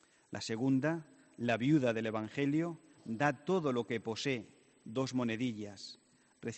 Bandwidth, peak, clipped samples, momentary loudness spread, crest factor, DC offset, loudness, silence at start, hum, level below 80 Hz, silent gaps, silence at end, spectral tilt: 8.4 kHz; -16 dBFS; under 0.1%; 15 LU; 20 dB; under 0.1%; -35 LUFS; 0.3 s; none; -76 dBFS; none; 0 s; -6 dB/octave